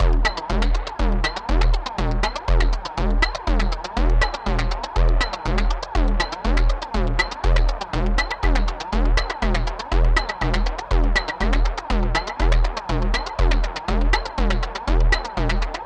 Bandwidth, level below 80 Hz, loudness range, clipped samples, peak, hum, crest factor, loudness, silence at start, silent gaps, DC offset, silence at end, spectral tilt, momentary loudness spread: 8.6 kHz; -20 dBFS; 0 LU; under 0.1%; -4 dBFS; none; 14 dB; -23 LUFS; 0 s; none; under 0.1%; 0 s; -5.5 dB/octave; 4 LU